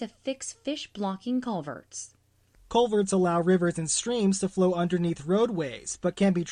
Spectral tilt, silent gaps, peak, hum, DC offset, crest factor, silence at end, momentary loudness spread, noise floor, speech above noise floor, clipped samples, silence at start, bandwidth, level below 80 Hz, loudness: -5 dB/octave; none; -10 dBFS; none; under 0.1%; 16 dB; 0 s; 10 LU; -62 dBFS; 35 dB; under 0.1%; 0 s; 10.5 kHz; -60 dBFS; -27 LUFS